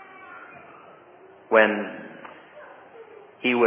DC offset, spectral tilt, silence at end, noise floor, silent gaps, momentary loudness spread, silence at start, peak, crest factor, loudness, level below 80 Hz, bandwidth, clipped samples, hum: under 0.1%; -8.5 dB/octave; 0 s; -50 dBFS; none; 27 LU; 0.3 s; -4 dBFS; 22 dB; -22 LUFS; -78 dBFS; 3.7 kHz; under 0.1%; none